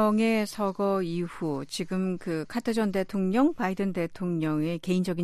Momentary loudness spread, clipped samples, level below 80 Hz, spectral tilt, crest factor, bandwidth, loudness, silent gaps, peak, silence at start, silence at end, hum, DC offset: 7 LU; under 0.1%; -58 dBFS; -6.5 dB/octave; 14 dB; 14 kHz; -28 LUFS; none; -12 dBFS; 0 s; 0 s; none; under 0.1%